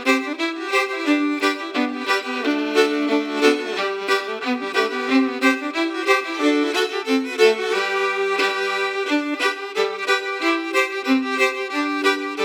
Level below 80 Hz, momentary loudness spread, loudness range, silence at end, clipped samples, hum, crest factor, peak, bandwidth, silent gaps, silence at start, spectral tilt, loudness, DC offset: -88 dBFS; 5 LU; 1 LU; 0 s; under 0.1%; none; 18 dB; -2 dBFS; 17.5 kHz; none; 0 s; -2 dB/octave; -20 LUFS; under 0.1%